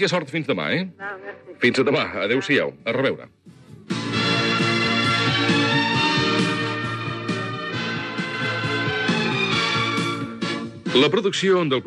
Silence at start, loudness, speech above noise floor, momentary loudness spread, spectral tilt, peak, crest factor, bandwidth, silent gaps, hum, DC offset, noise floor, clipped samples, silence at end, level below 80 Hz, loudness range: 0 s; -21 LUFS; 24 dB; 9 LU; -5 dB/octave; -4 dBFS; 18 dB; 12 kHz; none; none; under 0.1%; -45 dBFS; under 0.1%; 0 s; -60 dBFS; 3 LU